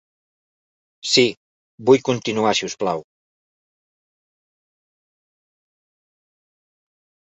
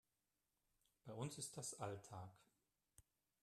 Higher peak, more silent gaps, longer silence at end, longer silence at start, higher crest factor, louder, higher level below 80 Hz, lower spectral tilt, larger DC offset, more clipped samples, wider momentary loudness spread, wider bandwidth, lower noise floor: first, -2 dBFS vs -34 dBFS; first, 1.37-1.78 s vs none; first, 4.25 s vs 0.4 s; about the same, 1.05 s vs 1.05 s; about the same, 24 dB vs 22 dB; first, -19 LUFS vs -52 LUFS; first, -66 dBFS vs -84 dBFS; about the same, -3.5 dB/octave vs -4 dB/octave; neither; neither; about the same, 9 LU vs 11 LU; second, 8.2 kHz vs 13.5 kHz; about the same, under -90 dBFS vs under -90 dBFS